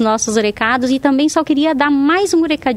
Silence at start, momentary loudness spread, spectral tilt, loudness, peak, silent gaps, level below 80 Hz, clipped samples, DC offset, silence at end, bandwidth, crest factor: 0 s; 2 LU; -3.5 dB/octave; -14 LUFS; 0 dBFS; none; -48 dBFS; under 0.1%; 0.1%; 0 s; 13 kHz; 14 dB